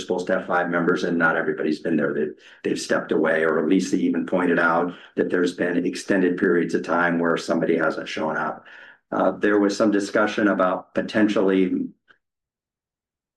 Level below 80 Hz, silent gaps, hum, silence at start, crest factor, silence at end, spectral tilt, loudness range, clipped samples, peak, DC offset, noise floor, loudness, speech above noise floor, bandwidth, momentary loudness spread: -68 dBFS; none; none; 0 s; 14 dB; 1.45 s; -5.5 dB/octave; 2 LU; under 0.1%; -8 dBFS; under 0.1%; under -90 dBFS; -22 LUFS; over 68 dB; 12 kHz; 7 LU